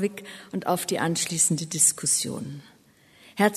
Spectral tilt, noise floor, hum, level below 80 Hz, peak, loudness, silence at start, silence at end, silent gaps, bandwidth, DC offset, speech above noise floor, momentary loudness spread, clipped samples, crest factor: -3 dB/octave; -57 dBFS; none; -68 dBFS; -6 dBFS; -23 LUFS; 0 s; 0 s; none; 13.5 kHz; under 0.1%; 31 dB; 19 LU; under 0.1%; 20 dB